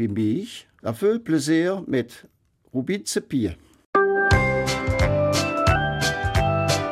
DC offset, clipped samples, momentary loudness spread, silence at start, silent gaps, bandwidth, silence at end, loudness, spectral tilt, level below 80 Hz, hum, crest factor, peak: under 0.1%; under 0.1%; 10 LU; 0 s; 3.85-3.93 s; 16 kHz; 0 s; -22 LUFS; -5 dB/octave; -36 dBFS; none; 18 dB; -4 dBFS